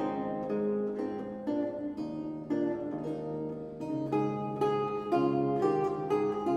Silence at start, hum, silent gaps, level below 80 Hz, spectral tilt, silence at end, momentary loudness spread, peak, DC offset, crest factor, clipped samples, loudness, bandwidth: 0 s; none; none; -66 dBFS; -8.5 dB/octave; 0 s; 8 LU; -16 dBFS; under 0.1%; 16 dB; under 0.1%; -32 LUFS; 9.8 kHz